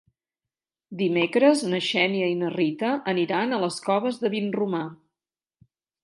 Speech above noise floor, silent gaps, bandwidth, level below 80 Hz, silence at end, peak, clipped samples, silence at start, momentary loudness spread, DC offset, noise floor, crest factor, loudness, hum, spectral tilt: over 66 dB; none; 11.5 kHz; -76 dBFS; 1.1 s; -6 dBFS; under 0.1%; 0.9 s; 8 LU; under 0.1%; under -90 dBFS; 20 dB; -24 LUFS; none; -5 dB/octave